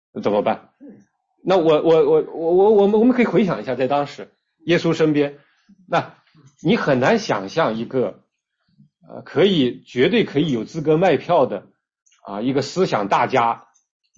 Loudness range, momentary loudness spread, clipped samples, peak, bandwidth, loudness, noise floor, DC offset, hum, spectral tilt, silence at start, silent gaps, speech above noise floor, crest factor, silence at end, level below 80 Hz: 5 LU; 11 LU; under 0.1%; -4 dBFS; 7.6 kHz; -19 LUFS; -70 dBFS; under 0.1%; none; -6.5 dB/octave; 0.15 s; 12.02-12.06 s; 51 dB; 16 dB; 0.6 s; -60 dBFS